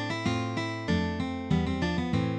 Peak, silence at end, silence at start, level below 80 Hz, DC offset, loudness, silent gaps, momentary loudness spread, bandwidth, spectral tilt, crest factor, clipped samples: -14 dBFS; 0 s; 0 s; -44 dBFS; under 0.1%; -30 LUFS; none; 3 LU; 9.6 kHz; -6.5 dB/octave; 16 dB; under 0.1%